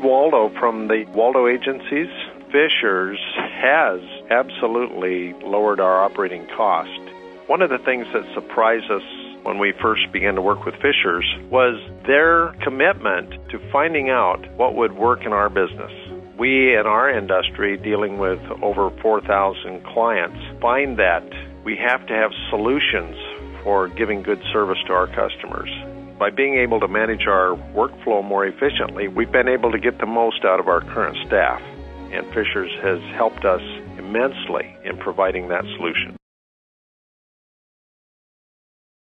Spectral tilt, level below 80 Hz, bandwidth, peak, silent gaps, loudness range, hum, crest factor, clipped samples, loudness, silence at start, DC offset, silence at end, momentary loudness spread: -7 dB/octave; -44 dBFS; 5.6 kHz; -2 dBFS; none; 5 LU; none; 18 dB; under 0.1%; -19 LUFS; 0 s; under 0.1%; 2.85 s; 11 LU